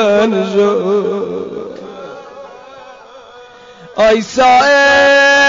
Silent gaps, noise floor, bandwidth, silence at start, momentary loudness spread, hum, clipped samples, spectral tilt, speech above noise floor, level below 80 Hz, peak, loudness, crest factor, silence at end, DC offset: none; -37 dBFS; 7.6 kHz; 0 s; 22 LU; none; under 0.1%; -1.5 dB/octave; 27 dB; -48 dBFS; -4 dBFS; -11 LUFS; 10 dB; 0 s; under 0.1%